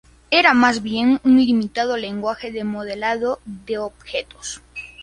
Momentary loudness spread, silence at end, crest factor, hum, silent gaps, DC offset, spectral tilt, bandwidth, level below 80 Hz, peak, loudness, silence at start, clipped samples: 16 LU; 0 s; 20 dB; none; none; under 0.1%; -4 dB/octave; 10.5 kHz; -52 dBFS; 0 dBFS; -19 LUFS; 0.3 s; under 0.1%